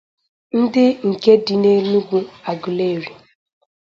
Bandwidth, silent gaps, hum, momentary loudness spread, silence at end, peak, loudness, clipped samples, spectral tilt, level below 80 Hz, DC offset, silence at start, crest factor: 7.4 kHz; none; none; 12 LU; 0.75 s; 0 dBFS; -17 LUFS; under 0.1%; -7.5 dB/octave; -64 dBFS; under 0.1%; 0.55 s; 18 dB